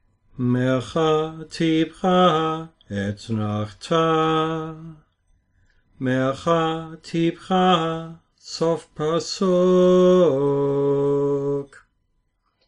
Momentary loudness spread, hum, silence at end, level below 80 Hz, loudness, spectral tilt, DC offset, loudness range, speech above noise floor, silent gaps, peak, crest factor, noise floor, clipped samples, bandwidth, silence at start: 13 LU; none; 1 s; -56 dBFS; -21 LUFS; -6.5 dB/octave; under 0.1%; 6 LU; 49 dB; none; -6 dBFS; 16 dB; -69 dBFS; under 0.1%; 10.5 kHz; 0.35 s